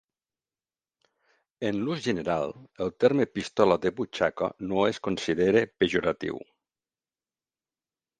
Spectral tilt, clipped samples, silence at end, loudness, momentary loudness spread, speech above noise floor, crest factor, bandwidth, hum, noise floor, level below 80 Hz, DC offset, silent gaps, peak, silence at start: -5.5 dB/octave; under 0.1%; 1.75 s; -27 LUFS; 10 LU; over 64 dB; 24 dB; 9.4 kHz; none; under -90 dBFS; -60 dBFS; under 0.1%; none; -4 dBFS; 1.6 s